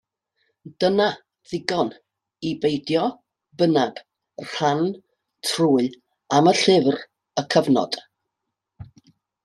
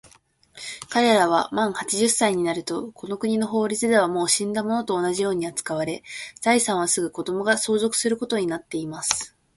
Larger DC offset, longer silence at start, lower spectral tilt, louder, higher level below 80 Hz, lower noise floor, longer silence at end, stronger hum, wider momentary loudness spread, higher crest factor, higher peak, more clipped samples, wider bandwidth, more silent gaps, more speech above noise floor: neither; about the same, 0.65 s vs 0.55 s; first, -5 dB/octave vs -3 dB/octave; about the same, -22 LUFS vs -23 LUFS; about the same, -64 dBFS vs -62 dBFS; first, -82 dBFS vs -57 dBFS; first, 0.6 s vs 0.3 s; neither; first, 14 LU vs 10 LU; about the same, 20 dB vs 22 dB; about the same, -2 dBFS vs -2 dBFS; neither; about the same, 13 kHz vs 12 kHz; neither; first, 61 dB vs 34 dB